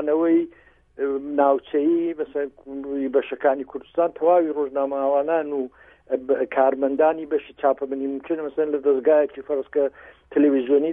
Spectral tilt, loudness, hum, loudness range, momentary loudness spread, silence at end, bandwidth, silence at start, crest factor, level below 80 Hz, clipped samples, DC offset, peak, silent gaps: -9 dB/octave; -22 LUFS; none; 2 LU; 10 LU; 0 s; 3.7 kHz; 0 s; 16 dB; -62 dBFS; under 0.1%; under 0.1%; -6 dBFS; none